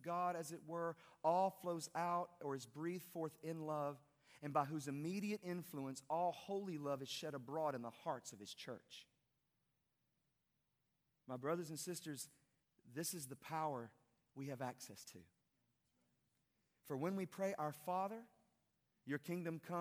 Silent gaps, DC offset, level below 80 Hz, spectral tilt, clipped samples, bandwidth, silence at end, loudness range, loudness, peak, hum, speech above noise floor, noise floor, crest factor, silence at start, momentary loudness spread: none; under 0.1%; under -90 dBFS; -5 dB/octave; under 0.1%; over 20 kHz; 0 s; 8 LU; -45 LUFS; -24 dBFS; none; 42 dB; -87 dBFS; 22 dB; 0 s; 12 LU